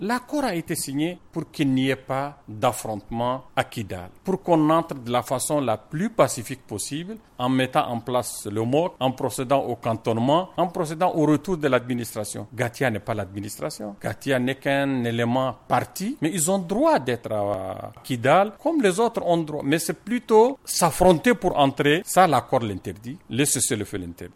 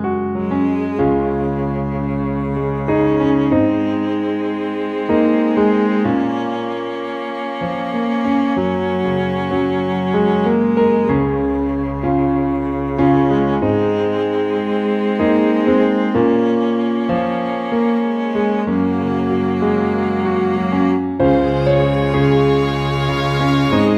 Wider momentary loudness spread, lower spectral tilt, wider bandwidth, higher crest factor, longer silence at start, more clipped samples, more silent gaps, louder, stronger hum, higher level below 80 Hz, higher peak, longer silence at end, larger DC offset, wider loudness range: first, 12 LU vs 6 LU; second, -4.5 dB/octave vs -8.5 dB/octave; first, 16.5 kHz vs 8.2 kHz; about the same, 18 dB vs 14 dB; about the same, 0 s vs 0 s; neither; neither; second, -23 LUFS vs -17 LUFS; neither; second, -52 dBFS vs -38 dBFS; about the same, -4 dBFS vs -2 dBFS; about the same, 0.1 s vs 0 s; neither; first, 6 LU vs 3 LU